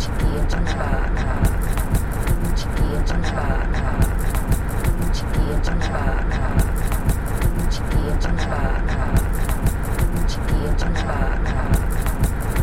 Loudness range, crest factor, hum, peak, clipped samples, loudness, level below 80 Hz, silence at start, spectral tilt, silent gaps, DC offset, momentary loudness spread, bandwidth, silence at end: 0 LU; 14 dB; none; -6 dBFS; under 0.1%; -23 LUFS; -20 dBFS; 0 s; -6 dB/octave; none; under 0.1%; 2 LU; 16.5 kHz; 0 s